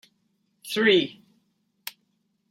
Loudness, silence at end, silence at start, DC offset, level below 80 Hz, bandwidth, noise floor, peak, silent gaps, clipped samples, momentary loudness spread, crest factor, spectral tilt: -22 LUFS; 0.6 s; 0.65 s; under 0.1%; -78 dBFS; 16.5 kHz; -72 dBFS; -8 dBFS; none; under 0.1%; 20 LU; 20 dB; -4 dB/octave